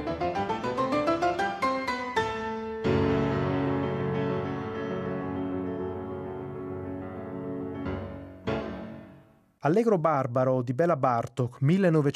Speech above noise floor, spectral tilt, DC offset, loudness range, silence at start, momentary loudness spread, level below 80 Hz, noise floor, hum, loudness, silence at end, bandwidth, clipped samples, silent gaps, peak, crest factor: 32 dB; -7.5 dB/octave; under 0.1%; 8 LU; 0 s; 13 LU; -54 dBFS; -56 dBFS; none; -29 LUFS; 0 s; 12 kHz; under 0.1%; none; -10 dBFS; 18 dB